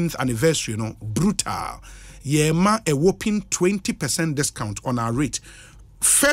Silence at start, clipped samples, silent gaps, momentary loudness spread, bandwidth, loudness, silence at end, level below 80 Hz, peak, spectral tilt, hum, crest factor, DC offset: 0 s; under 0.1%; none; 10 LU; 16 kHz; -22 LUFS; 0 s; -44 dBFS; -4 dBFS; -4 dB/octave; none; 18 dB; under 0.1%